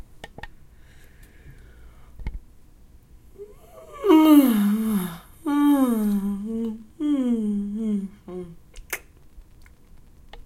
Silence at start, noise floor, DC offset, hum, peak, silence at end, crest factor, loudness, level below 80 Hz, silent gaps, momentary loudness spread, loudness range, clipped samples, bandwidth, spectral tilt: 0.15 s; -49 dBFS; under 0.1%; none; -4 dBFS; 0.05 s; 20 dB; -22 LUFS; -46 dBFS; none; 26 LU; 9 LU; under 0.1%; 16.5 kHz; -6.5 dB/octave